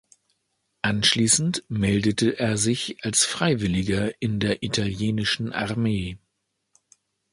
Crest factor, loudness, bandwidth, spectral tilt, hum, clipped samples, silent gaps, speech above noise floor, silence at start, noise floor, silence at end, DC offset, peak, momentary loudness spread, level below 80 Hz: 20 dB; -23 LUFS; 11.5 kHz; -3.5 dB/octave; none; under 0.1%; none; 53 dB; 0.85 s; -77 dBFS; 1.15 s; under 0.1%; -4 dBFS; 7 LU; -48 dBFS